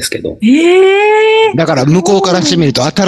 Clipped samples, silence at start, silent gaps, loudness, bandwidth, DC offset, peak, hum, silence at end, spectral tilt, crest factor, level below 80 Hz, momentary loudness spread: under 0.1%; 0 s; none; -9 LUFS; 12.5 kHz; under 0.1%; 0 dBFS; none; 0 s; -5 dB/octave; 8 dB; -46 dBFS; 5 LU